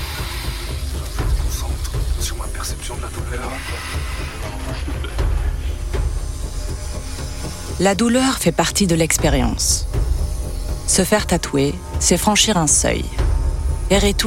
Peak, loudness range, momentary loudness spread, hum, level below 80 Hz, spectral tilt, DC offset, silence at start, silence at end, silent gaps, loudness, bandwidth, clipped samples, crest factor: -2 dBFS; 9 LU; 12 LU; none; -24 dBFS; -4 dB/octave; 0.7%; 0 s; 0 s; none; -20 LUFS; 17 kHz; under 0.1%; 18 dB